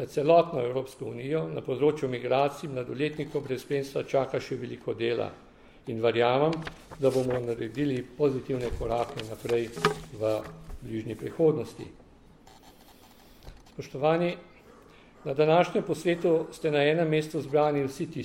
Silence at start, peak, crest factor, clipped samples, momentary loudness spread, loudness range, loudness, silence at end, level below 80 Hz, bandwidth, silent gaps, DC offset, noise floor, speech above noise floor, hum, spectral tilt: 0 s; -6 dBFS; 22 dB; under 0.1%; 13 LU; 7 LU; -28 LUFS; 0 s; -52 dBFS; 16 kHz; none; under 0.1%; -54 dBFS; 26 dB; none; -6.5 dB/octave